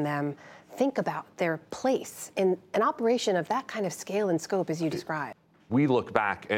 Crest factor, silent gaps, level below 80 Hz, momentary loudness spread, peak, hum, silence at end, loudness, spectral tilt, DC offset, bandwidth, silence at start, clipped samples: 24 dB; none; -72 dBFS; 9 LU; -4 dBFS; none; 0 s; -29 LUFS; -5.5 dB/octave; under 0.1%; 16.5 kHz; 0 s; under 0.1%